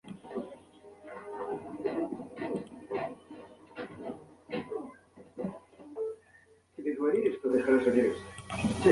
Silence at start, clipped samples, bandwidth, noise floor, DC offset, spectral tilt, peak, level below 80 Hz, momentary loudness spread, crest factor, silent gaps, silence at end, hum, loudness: 0.05 s; under 0.1%; 11.5 kHz; -62 dBFS; under 0.1%; -6.5 dB/octave; -8 dBFS; -60 dBFS; 22 LU; 24 dB; none; 0 s; none; -33 LUFS